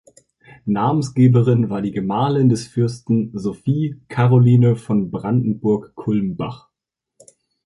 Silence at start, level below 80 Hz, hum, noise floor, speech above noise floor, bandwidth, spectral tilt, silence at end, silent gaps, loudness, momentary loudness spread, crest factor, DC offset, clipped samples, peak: 0.65 s; -54 dBFS; none; -83 dBFS; 66 dB; 11 kHz; -8.5 dB/octave; 1.1 s; none; -18 LUFS; 11 LU; 16 dB; under 0.1%; under 0.1%; -2 dBFS